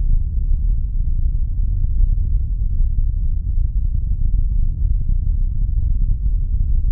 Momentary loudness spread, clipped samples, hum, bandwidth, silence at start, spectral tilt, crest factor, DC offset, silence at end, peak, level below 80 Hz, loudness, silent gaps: 2 LU; under 0.1%; none; 0.6 kHz; 0 s; -14 dB/octave; 10 dB; under 0.1%; 0 s; -6 dBFS; -16 dBFS; -23 LUFS; none